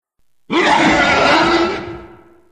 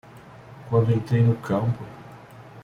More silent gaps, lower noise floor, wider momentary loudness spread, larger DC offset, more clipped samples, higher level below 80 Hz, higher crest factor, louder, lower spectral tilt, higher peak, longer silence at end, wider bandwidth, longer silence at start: neither; second, -41 dBFS vs -45 dBFS; second, 11 LU vs 23 LU; first, 0.2% vs under 0.1%; neither; first, -40 dBFS vs -54 dBFS; about the same, 14 dB vs 16 dB; first, -13 LUFS vs -23 LUFS; second, -4 dB/octave vs -9 dB/octave; first, -2 dBFS vs -8 dBFS; first, 0.45 s vs 0.05 s; first, 9.8 kHz vs 6.8 kHz; first, 0.5 s vs 0.15 s